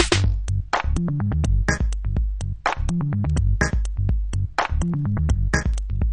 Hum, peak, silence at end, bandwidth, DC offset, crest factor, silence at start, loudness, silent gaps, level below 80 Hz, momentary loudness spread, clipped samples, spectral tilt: none; -4 dBFS; 0 s; 10 kHz; under 0.1%; 18 dB; 0 s; -23 LUFS; none; -24 dBFS; 4 LU; under 0.1%; -5.5 dB/octave